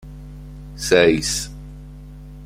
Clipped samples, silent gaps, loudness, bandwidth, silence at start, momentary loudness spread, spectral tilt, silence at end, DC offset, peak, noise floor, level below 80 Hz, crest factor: under 0.1%; none; -18 LUFS; 16 kHz; 0.05 s; 25 LU; -3.5 dB/octave; 0 s; under 0.1%; -2 dBFS; -37 dBFS; -38 dBFS; 20 dB